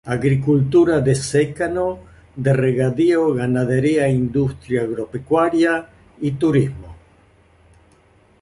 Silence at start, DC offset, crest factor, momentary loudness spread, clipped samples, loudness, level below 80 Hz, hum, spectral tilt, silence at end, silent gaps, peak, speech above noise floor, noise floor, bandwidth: 0.05 s; under 0.1%; 14 dB; 10 LU; under 0.1%; -18 LUFS; -46 dBFS; none; -7 dB/octave; 1.5 s; none; -4 dBFS; 36 dB; -54 dBFS; 11.5 kHz